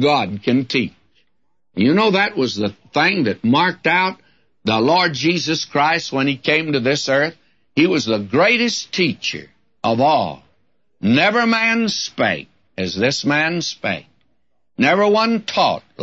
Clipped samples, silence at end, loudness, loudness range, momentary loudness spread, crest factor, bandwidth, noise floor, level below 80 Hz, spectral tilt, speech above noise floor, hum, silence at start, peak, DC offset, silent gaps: under 0.1%; 0 s; -17 LUFS; 2 LU; 10 LU; 14 dB; 8 kHz; -73 dBFS; -60 dBFS; -4.5 dB/octave; 56 dB; none; 0 s; -4 dBFS; 0.1%; none